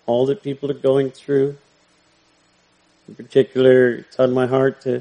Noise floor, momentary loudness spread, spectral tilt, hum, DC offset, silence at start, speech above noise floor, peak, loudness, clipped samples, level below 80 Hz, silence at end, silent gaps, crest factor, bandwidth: -59 dBFS; 8 LU; -7.5 dB/octave; 60 Hz at -65 dBFS; under 0.1%; 0.05 s; 41 dB; -2 dBFS; -18 LUFS; under 0.1%; -64 dBFS; 0 s; none; 18 dB; 9.4 kHz